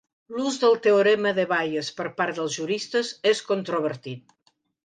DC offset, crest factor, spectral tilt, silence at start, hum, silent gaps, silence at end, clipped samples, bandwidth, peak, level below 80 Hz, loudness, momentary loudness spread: under 0.1%; 16 dB; -4 dB/octave; 0.3 s; none; none; 0.65 s; under 0.1%; 9.8 kHz; -8 dBFS; -76 dBFS; -24 LUFS; 12 LU